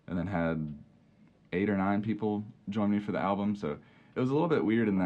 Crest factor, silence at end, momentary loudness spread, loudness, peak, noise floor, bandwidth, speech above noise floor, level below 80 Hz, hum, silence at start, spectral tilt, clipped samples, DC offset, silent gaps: 16 dB; 0 s; 10 LU; -31 LUFS; -16 dBFS; -61 dBFS; 7 kHz; 32 dB; -60 dBFS; none; 0.1 s; -9 dB/octave; under 0.1%; under 0.1%; none